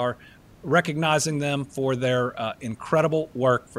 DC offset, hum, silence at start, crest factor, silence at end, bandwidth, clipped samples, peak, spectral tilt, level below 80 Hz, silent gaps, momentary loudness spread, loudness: under 0.1%; none; 0 s; 18 dB; 0 s; 15.5 kHz; under 0.1%; -6 dBFS; -5 dB/octave; -58 dBFS; none; 9 LU; -24 LUFS